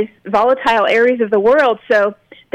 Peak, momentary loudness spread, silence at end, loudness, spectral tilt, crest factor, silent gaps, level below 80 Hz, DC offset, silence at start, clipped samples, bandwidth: -4 dBFS; 4 LU; 0.4 s; -14 LUFS; -5 dB/octave; 10 dB; none; -54 dBFS; under 0.1%; 0 s; under 0.1%; 9.4 kHz